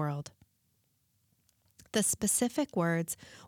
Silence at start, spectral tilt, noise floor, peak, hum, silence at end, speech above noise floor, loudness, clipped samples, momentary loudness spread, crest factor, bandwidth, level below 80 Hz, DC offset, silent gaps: 0 s; -4 dB/octave; -74 dBFS; -16 dBFS; none; 0 s; 43 dB; -31 LUFS; under 0.1%; 11 LU; 18 dB; 19 kHz; -68 dBFS; under 0.1%; none